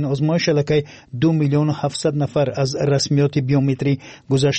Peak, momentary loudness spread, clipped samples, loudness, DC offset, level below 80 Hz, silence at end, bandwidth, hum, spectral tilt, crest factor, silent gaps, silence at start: -6 dBFS; 4 LU; under 0.1%; -19 LUFS; under 0.1%; -52 dBFS; 0 s; 8.8 kHz; none; -6 dB/octave; 12 dB; none; 0 s